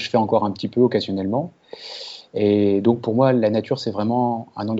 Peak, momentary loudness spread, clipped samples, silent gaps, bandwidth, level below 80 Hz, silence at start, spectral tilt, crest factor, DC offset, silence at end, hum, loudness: -4 dBFS; 15 LU; under 0.1%; none; 8 kHz; -66 dBFS; 0 s; -7.5 dB/octave; 16 dB; under 0.1%; 0 s; none; -20 LUFS